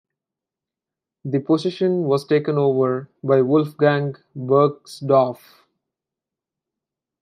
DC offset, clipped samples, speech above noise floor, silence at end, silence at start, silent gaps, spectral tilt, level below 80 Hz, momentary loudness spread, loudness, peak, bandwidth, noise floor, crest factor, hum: under 0.1%; under 0.1%; 68 dB; 1.85 s; 1.25 s; none; -8 dB/octave; -72 dBFS; 11 LU; -20 LUFS; -4 dBFS; 13.5 kHz; -87 dBFS; 18 dB; none